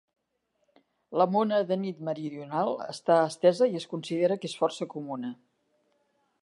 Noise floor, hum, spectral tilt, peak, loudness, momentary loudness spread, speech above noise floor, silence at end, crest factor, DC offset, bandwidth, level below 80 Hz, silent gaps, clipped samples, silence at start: -77 dBFS; none; -6 dB/octave; -10 dBFS; -28 LUFS; 12 LU; 49 dB; 1.1 s; 20 dB; under 0.1%; 11.5 kHz; -84 dBFS; none; under 0.1%; 1.1 s